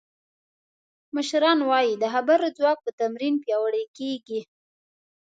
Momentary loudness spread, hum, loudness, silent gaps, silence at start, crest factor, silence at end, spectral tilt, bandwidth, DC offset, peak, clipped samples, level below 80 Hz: 11 LU; none; -24 LUFS; 2.93-2.98 s, 3.88-3.94 s; 1.15 s; 18 dB; 0.95 s; -3.5 dB/octave; 9.2 kHz; under 0.1%; -6 dBFS; under 0.1%; -82 dBFS